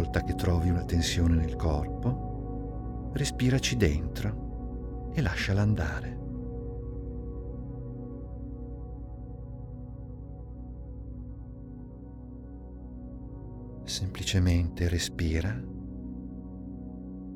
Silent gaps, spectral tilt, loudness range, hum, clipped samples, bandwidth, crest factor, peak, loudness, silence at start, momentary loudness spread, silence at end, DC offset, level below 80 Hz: none; -5.5 dB/octave; 14 LU; none; under 0.1%; 15.5 kHz; 20 dB; -12 dBFS; -32 LUFS; 0 s; 17 LU; 0 s; under 0.1%; -40 dBFS